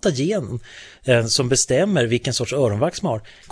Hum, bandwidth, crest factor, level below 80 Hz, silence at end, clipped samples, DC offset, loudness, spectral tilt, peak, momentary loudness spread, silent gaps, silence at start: none; 11 kHz; 18 dB; -50 dBFS; 0.2 s; under 0.1%; under 0.1%; -20 LUFS; -4 dB/octave; -2 dBFS; 13 LU; none; 0 s